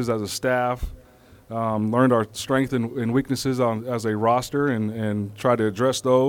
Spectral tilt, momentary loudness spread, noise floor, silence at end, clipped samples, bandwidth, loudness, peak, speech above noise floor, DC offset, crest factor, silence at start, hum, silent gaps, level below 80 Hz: -6 dB/octave; 7 LU; -51 dBFS; 0 s; under 0.1%; 17.5 kHz; -23 LUFS; -6 dBFS; 29 dB; under 0.1%; 16 dB; 0 s; none; none; -44 dBFS